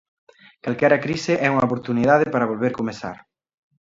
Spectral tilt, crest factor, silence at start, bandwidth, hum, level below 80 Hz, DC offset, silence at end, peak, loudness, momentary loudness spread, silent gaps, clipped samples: -6.5 dB/octave; 20 dB; 0.65 s; 7.8 kHz; none; -58 dBFS; under 0.1%; 0.85 s; -2 dBFS; -20 LUFS; 12 LU; none; under 0.1%